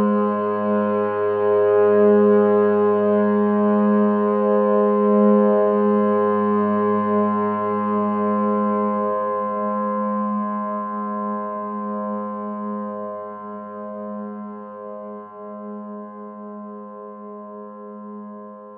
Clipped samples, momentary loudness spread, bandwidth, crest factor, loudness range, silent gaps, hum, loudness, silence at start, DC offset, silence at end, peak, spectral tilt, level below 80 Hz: under 0.1%; 20 LU; 3.3 kHz; 14 dB; 17 LU; none; none; -19 LUFS; 0 s; under 0.1%; 0 s; -6 dBFS; -13 dB/octave; -76 dBFS